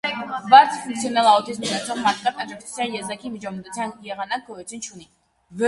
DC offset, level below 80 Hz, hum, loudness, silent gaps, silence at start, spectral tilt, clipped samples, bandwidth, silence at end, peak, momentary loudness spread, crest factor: under 0.1%; -64 dBFS; none; -21 LUFS; none; 0.05 s; -3 dB/octave; under 0.1%; 11.5 kHz; 0 s; 0 dBFS; 20 LU; 22 dB